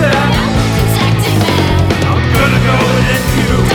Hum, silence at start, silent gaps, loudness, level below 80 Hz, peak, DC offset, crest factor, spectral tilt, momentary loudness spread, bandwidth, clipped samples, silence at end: none; 0 s; none; -11 LUFS; -22 dBFS; 0 dBFS; 0.4%; 10 dB; -5.5 dB/octave; 2 LU; 19.5 kHz; under 0.1%; 0 s